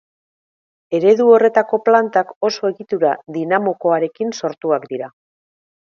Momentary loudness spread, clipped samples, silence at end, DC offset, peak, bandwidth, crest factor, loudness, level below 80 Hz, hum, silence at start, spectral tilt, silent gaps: 12 LU; under 0.1%; 0.9 s; under 0.1%; 0 dBFS; 7 kHz; 18 dB; -16 LUFS; -72 dBFS; none; 0.9 s; -5.5 dB/octave; 2.36-2.41 s